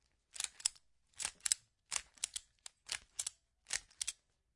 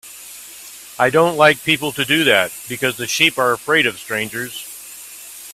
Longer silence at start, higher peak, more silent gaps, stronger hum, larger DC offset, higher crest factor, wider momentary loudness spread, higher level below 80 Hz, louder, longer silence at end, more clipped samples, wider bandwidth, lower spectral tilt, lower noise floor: first, 0.35 s vs 0.05 s; second, -10 dBFS vs 0 dBFS; neither; neither; neither; first, 34 dB vs 18 dB; second, 12 LU vs 21 LU; second, -74 dBFS vs -58 dBFS; second, -41 LUFS vs -16 LUFS; first, 0.45 s vs 0 s; neither; second, 11.5 kHz vs 16 kHz; second, 3 dB/octave vs -3 dB/octave; first, -66 dBFS vs -37 dBFS